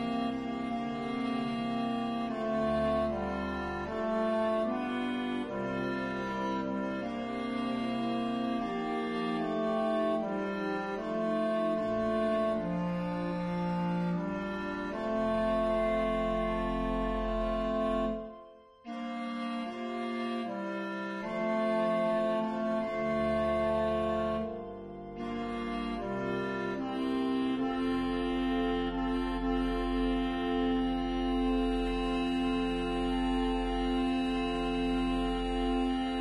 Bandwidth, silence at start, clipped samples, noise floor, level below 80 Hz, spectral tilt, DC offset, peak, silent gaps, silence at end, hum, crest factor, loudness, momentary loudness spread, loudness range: 11.5 kHz; 0 s; under 0.1%; -53 dBFS; -46 dBFS; -7 dB/octave; under 0.1%; -20 dBFS; none; 0 s; none; 12 dB; -32 LUFS; 6 LU; 3 LU